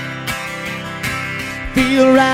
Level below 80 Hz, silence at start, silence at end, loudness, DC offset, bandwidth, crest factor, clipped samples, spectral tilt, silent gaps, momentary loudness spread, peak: -36 dBFS; 0 s; 0 s; -18 LUFS; under 0.1%; 16 kHz; 16 dB; under 0.1%; -4.5 dB/octave; none; 12 LU; -2 dBFS